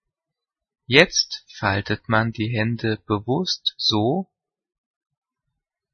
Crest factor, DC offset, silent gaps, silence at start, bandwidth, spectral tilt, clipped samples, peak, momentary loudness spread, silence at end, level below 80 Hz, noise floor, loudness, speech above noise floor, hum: 24 dB; under 0.1%; none; 0.9 s; 9.4 kHz; -4.5 dB/octave; under 0.1%; 0 dBFS; 10 LU; 1.7 s; -56 dBFS; -87 dBFS; -21 LUFS; 65 dB; none